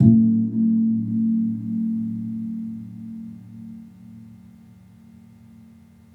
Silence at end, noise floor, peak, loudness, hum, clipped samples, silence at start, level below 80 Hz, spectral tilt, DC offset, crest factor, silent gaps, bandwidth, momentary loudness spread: 1.8 s; -49 dBFS; -2 dBFS; -22 LUFS; none; under 0.1%; 0 s; -60 dBFS; -12.5 dB/octave; under 0.1%; 22 dB; none; 1 kHz; 22 LU